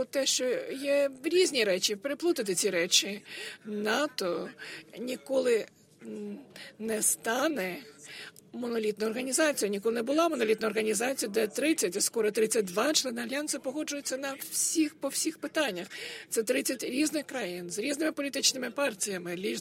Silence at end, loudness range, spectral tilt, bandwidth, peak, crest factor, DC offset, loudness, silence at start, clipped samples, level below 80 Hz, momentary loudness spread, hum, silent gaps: 0 s; 4 LU; -2 dB/octave; 16 kHz; -8 dBFS; 22 dB; under 0.1%; -29 LUFS; 0 s; under 0.1%; -78 dBFS; 13 LU; none; none